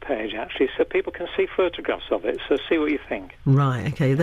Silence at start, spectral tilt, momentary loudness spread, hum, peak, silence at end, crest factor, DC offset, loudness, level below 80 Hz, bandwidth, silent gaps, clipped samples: 0 s; -8 dB/octave; 8 LU; none; -8 dBFS; 0 s; 14 dB; under 0.1%; -24 LUFS; -48 dBFS; 7.6 kHz; none; under 0.1%